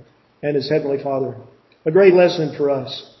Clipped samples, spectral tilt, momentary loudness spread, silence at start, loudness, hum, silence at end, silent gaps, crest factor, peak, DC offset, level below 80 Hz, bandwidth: under 0.1%; -7 dB/octave; 15 LU; 0.45 s; -18 LUFS; none; 0.15 s; none; 18 dB; 0 dBFS; under 0.1%; -64 dBFS; 6 kHz